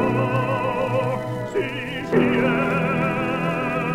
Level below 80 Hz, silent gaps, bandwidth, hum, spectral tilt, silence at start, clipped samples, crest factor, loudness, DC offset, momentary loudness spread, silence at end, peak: -48 dBFS; none; 15.5 kHz; none; -7.5 dB/octave; 0 s; under 0.1%; 16 dB; -22 LUFS; under 0.1%; 6 LU; 0 s; -6 dBFS